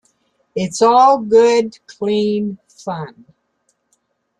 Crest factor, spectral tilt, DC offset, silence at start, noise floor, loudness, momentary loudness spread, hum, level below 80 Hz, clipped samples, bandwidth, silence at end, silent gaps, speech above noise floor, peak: 16 dB; -5 dB/octave; under 0.1%; 0.55 s; -66 dBFS; -15 LUFS; 17 LU; none; -62 dBFS; under 0.1%; 10.5 kHz; 1.3 s; none; 51 dB; -2 dBFS